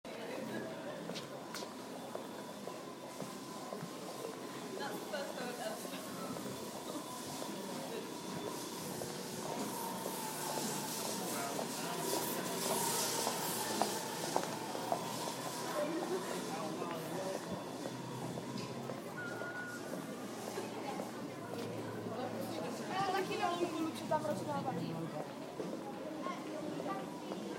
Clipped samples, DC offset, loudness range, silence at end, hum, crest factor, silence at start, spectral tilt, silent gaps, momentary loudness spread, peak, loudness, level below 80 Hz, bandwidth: under 0.1%; under 0.1%; 8 LU; 0 s; none; 26 dB; 0.05 s; -3.5 dB/octave; none; 9 LU; -16 dBFS; -41 LUFS; -80 dBFS; 16.5 kHz